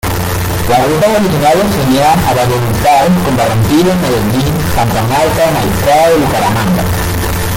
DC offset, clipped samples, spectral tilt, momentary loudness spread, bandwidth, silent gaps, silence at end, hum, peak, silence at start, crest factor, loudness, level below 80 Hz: under 0.1%; under 0.1%; -5.5 dB/octave; 5 LU; 17 kHz; none; 0 s; none; 0 dBFS; 0.05 s; 10 dB; -10 LUFS; -26 dBFS